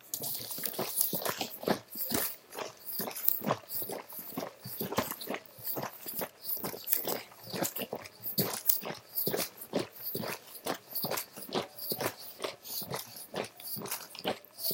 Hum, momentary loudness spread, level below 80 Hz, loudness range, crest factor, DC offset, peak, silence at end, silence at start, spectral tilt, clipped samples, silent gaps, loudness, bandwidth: none; 11 LU; -74 dBFS; 5 LU; 34 dB; under 0.1%; -2 dBFS; 0 s; 0 s; -3 dB/octave; under 0.1%; none; -34 LUFS; 17 kHz